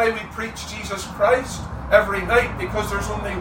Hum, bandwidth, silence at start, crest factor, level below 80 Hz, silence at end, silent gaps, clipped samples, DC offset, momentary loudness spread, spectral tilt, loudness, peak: none; 16.5 kHz; 0 s; 20 dB; -36 dBFS; 0 s; none; under 0.1%; under 0.1%; 12 LU; -4.5 dB/octave; -22 LUFS; -2 dBFS